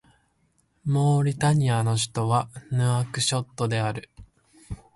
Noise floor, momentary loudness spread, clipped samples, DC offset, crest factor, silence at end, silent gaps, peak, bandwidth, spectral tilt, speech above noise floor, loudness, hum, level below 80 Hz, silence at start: -68 dBFS; 10 LU; under 0.1%; under 0.1%; 14 dB; 0.2 s; none; -10 dBFS; 11.5 kHz; -5 dB/octave; 44 dB; -24 LUFS; none; -54 dBFS; 0.85 s